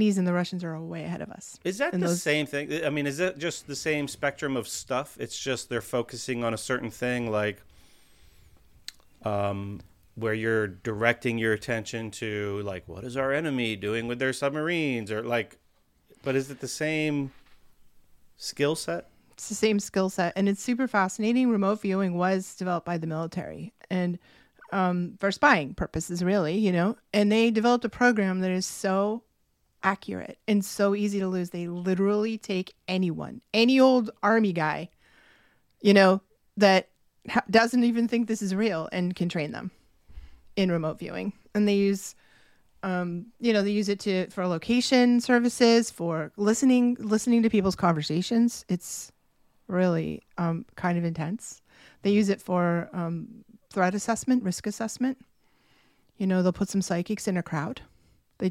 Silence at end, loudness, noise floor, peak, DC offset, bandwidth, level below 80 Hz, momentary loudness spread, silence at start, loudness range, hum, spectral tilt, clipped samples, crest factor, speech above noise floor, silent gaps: 0 s; -27 LUFS; -70 dBFS; -6 dBFS; under 0.1%; 15.5 kHz; -60 dBFS; 13 LU; 0 s; 7 LU; none; -5.5 dB/octave; under 0.1%; 22 dB; 44 dB; none